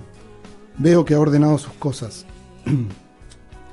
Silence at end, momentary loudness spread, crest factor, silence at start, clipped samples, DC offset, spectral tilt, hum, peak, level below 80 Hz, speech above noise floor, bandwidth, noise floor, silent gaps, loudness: 0.1 s; 18 LU; 16 dB; 0 s; under 0.1%; under 0.1%; -7.5 dB/octave; none; -4 dBFS; -46 dBFS; 26 dB; 11.5 kHz; -44 dBFS; none; -18 LUFS